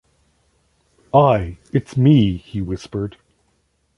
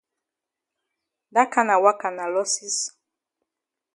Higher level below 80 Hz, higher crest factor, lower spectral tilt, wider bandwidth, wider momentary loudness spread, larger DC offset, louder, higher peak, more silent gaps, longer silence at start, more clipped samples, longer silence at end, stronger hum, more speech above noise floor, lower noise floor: first, -42 dBFS vs -82 dBFS; about the same, 18 dB vs 22 dB; first, -8.5 dB/octave vs -1.5 dB/octave; about the same, 10.5 kHz vs 11.5 kHz; first, 13 LU vs 8 LU; neither; first, -18 LUFS vs -22 LUFS; about the same, -2 dBFS vs -2 dBFS; neither; second, 1.15 s vs 1.35 s; neither; second, 0.9 s vs 1.05 s; neither; second, 48 dB vs 65 dB; second, -65 dBFS vs -86 dBFS